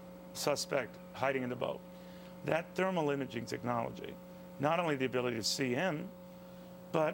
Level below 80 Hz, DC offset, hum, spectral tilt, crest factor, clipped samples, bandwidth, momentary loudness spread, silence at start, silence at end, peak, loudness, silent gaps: -70 dBFS; under 0.1%; none; -4.5 dB/octave; 22 dB; under 0.1%; 17 kHz; 18 LU; 0 s; 0 s; -14 dBFS; -36 LUFS; none